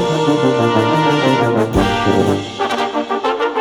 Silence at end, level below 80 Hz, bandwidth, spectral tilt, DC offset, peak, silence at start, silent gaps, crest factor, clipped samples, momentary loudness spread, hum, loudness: 0 s; -36 dBFS; 17 kHz; -6 dB/octave; under 0.1%; 0 dBFS; 0 s; none; 14 dB; under 0.1%; 5 LU; none; -15 LUFS